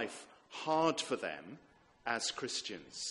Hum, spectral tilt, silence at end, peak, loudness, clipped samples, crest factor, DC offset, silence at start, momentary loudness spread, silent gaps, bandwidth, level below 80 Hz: none; -2.5 dB/octave; 0 s; -16 dBFS; -37 LUFS; under 0.1%; 22 dB; under 0.1%; 0 s; 18 LU; none; 11.5 kHz; -76 dBFS